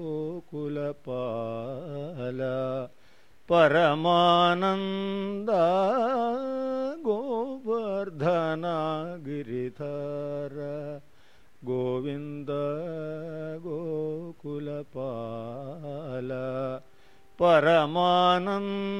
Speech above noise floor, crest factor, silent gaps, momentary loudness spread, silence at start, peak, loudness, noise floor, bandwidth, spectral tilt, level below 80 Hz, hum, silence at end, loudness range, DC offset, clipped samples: 34 dB; 20 dB; none; 15 LU; 0 s; -8 dBFS; -28 LUFS; -61 dBFS; 11 kHz; -7 dB/octave; -66 dBFS; none; 0 s; 10 LU; 0.3%; under 0.1%